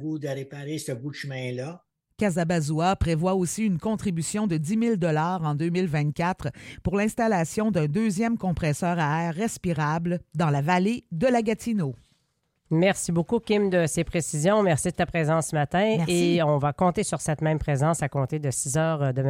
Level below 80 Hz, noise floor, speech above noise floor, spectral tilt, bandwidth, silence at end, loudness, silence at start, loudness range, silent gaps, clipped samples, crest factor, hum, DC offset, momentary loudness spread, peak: -48 dBFS; -73 dBFS; 48 dB; -6 dB/octave; 16 kHz; 0 s; -25 LUFS; 0 s; 3 LU; none; under 0.1%; 16 dB; none; under 0.1%; 9 LU; -10 dBFS